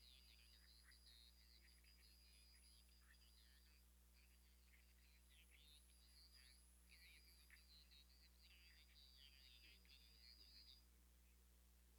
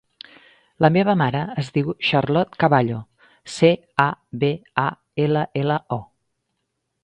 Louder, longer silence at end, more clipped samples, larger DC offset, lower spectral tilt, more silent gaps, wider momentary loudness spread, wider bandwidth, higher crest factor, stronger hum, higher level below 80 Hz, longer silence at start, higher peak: second, -68 LUFS vs -21 LUFS; second, 0 s vs 1 s; neither; neither; second, -2 dB/octave vs -7 dB/octave; neither; second, 3 LU vs 8 LU; first, over 20 kHz vs 10 kHz; about the same, 18 dB vs 22 dB; first, 60 Hz at -75 dBFS vs none; second, -74 dBFS vs -56 dBFS; second, 0 s vs 0.8 s; second, -52 dBFS vs 0 dBFS